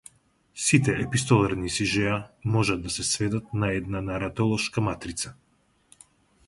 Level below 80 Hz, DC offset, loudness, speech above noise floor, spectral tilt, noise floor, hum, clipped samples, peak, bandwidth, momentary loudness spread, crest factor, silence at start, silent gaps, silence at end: -48 dBFS; under 0.1%; -26 LUFS; 36 dB; -4.5 dB/octave; -62 dBFS; none; under 0.1%; -4 dBFS; 11.5 kHz; 9 LU; 22 dB; 0.55 s; none; 1.15 s